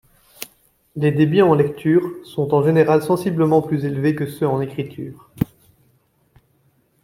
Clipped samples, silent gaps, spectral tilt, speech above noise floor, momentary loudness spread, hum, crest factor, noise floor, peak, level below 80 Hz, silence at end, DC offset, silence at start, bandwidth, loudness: under 0.1%; none; -8 dB/octave; 44 dB; 20 LU; none; 18 dB; -61 dBFS; -2 dBFS; -54 dBFS; 1.6 s; under 0.1%; 0.4 s; 16.5 kHz; -18 LUFS